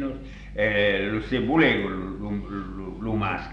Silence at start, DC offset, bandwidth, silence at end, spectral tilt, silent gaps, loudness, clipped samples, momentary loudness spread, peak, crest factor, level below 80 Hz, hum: 0 s; under 0.1%; 7.4 kHz; 0 s; -7.5 dB/octave; none; -25 LUFS; under 0.1%; 14 LU; -6 dBFS; 20 dB; -40 dBFS; none